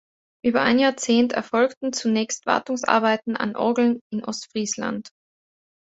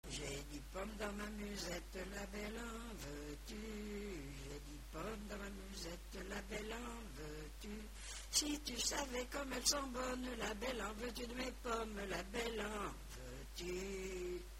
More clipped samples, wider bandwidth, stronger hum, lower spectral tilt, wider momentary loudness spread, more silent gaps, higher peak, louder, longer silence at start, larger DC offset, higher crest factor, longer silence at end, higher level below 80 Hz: neither; second, 8 kHz vs 16 kHz; neither; about the same, -3.5 dB/octave vs -3 dB/octave; second, 9 LU vs 13 LU; first, 1.77-1.81 s, 4.01-4.10 s vs none; first, -2 dBFS vs -22 dBFS; first, -22 LUFS vs -45 LUFS; first, 0.45 s vs 0.05 s; neither; about the same, 20 dB vs 24 dB; first, 0.75 s vs 0 s; second, -64 dBFS vs -54 dBFS